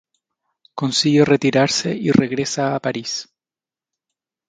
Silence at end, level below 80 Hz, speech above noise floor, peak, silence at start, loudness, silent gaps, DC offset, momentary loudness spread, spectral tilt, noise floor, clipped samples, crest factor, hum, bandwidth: 1.25 s; -56 dBFS; over 72 dB; 0 dBFS; 0.75 s; -18 LUFS; none; under 0.1%; 11 LU; -4.5 dB/octave; under -90 dBFS; under 0.1%; 20 dB; none; 9.4 kHz